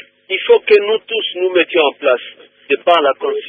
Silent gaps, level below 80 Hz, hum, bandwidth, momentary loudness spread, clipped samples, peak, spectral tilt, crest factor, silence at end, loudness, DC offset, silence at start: none; -66 dBFS; none; 4.9 kHz; 9 LU; under 0.1%; 0 dBFS; -4.5 dB/octave; 14 dB; 0 s; -14 LUFS; under 0.1%; 0.3 s